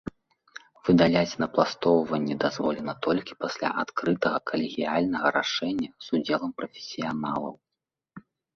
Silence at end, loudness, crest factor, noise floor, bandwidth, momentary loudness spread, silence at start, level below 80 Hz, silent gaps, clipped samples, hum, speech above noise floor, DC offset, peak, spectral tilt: 0.35 s; -27 LUFS; 22 dB; -87 dBFS; 7 kHz; 11 LU; 0.05 s; -60 dBFS; none; under 0.1%; none; 61 dB; under 0.1%; -6 dBFS; -5.5 dB/octave